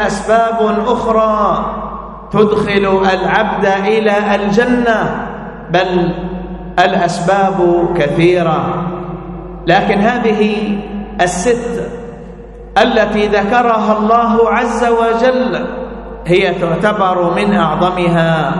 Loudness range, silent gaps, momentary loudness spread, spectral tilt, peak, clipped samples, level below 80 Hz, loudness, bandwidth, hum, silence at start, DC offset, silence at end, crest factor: 3 LU; none; 12 LU; -6 dB/octave; 0 dBFS; under 0.1%; -34 dBFS; -13 LUFS; 11.5 kHz; none; 0 s; under 0.1%; 0 s; 12 dB